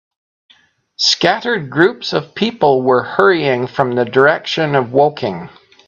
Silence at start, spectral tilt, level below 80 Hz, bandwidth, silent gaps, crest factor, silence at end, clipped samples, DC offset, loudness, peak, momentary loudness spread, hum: 1 s; -4.5 dB/octave; -58 dBFS; 7.4 kHz; none; 16 dB; 0.4 s; under 0.1%; under 0.1%; -14 LUFS; 0 dBFS; 8 LU; none